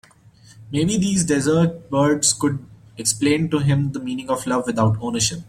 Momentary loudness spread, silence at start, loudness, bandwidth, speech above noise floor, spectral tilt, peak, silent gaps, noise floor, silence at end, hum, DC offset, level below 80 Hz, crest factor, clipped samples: 7 LU; 0.55 s; -20 LUFS; 15.5 kHz; 30 dB; -4.5 dB/octave; -2 dBFS; none; -49 dBFS; 0.05 s; none; under 0.1%; -50 dBFS; 18 dB; under 0.1%